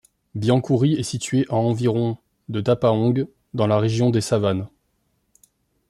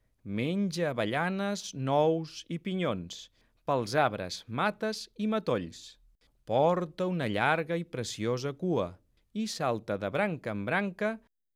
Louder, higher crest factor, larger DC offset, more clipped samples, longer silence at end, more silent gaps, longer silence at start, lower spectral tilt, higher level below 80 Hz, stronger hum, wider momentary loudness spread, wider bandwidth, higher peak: first, -21 LUFS vs -31 LUFS; about the same, 16 dB vs 20 dB; neither; neither; first, 1.2 s vs 0.4 s; neither; about the same, 0.35 s vs 0.25 s; first, -7 dB/octave vs -5.5 dB/octave; first, -58 dBFS vs -68 dBFS; neither; about the same, 10 LU vs 11 LU; second, 12.5 kHz vs 15 kHz; first, -4 dBFS vs -12 dBFS